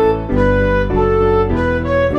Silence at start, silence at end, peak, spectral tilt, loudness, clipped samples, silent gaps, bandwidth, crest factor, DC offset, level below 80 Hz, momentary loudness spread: 0 s; 0 s; -2 dBFS; -8.5 dB/octave; -15 LUFS; under 0.1%; none; 7.2 kHz; 12 dB; under 0.1%; -24 dBFS; 2 LU